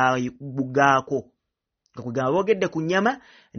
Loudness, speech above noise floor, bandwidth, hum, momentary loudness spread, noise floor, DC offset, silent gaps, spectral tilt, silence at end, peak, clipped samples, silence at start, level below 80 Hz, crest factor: -23 LUFS; 59 dB; 6.6 kHz; none; 12 LU; -82 dBFS; under 0.1%; none; -4.5 dB/octave; 0 s; -4 dBFS; under 0.1%; 0 s; -62 dBFS; 20 dB